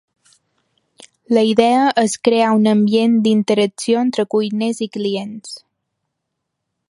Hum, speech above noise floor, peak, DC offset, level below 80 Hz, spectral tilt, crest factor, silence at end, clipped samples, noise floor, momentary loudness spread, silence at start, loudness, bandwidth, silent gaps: none; 61 dB; 0 dBFS; under 0.1%; -66 dBFS; -5 dB/octave; 18 dB; 1.3 s; under 0.1%; -76 dBFS; 10 LU; 1 s; -16 LUFS; 11.5 kHz; none